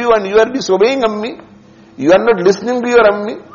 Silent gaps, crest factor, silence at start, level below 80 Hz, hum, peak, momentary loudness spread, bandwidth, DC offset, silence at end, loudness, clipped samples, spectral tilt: none; 12 dB; 0 s; -48 dBFS; none; 0 dBFS; 9 LU; 7.2 kHz; under 0.1%; 0.15 s; -12 LUFS; under 0.1%; -3.5 dB/octave